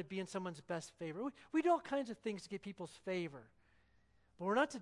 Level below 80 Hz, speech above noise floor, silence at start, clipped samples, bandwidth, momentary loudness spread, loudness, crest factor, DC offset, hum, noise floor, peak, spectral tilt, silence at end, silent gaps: -78 dBFS; 32 dB; 0 s; under 0.1%; 11.5 kHz; 13 LU; -41 LUFS; 22 dB; under 0.1%; 60 Hz at -70 dBFS; -72 dBFS; -20 dBFS; -5.5 dB/octave; 0 s; none